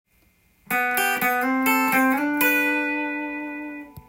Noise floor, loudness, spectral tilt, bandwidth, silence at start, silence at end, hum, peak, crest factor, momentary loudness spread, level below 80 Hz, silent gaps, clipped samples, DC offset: -61 dBFS; -21 LUFS; -2.5 dB/octave; 17 kHz; 0.7 s; 0.1 s; none; -6 dBFS; 16 dB; 12 LU; -64 dBFS; none; under 0.1%; under 0.1%